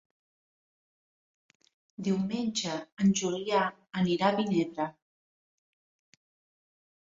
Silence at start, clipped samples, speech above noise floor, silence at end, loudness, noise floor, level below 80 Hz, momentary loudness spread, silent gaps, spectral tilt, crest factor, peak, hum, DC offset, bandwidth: 2 s; under 0.1%; over 61 dB; 2.2 s; -30 LUFS; under -90 dBFS; -72 dBFS; 9 LU; 2.92-2.97 s; -5 dB/octave; 22 dB; -12 dBFS; none; under 0.1%; 7.8 kHz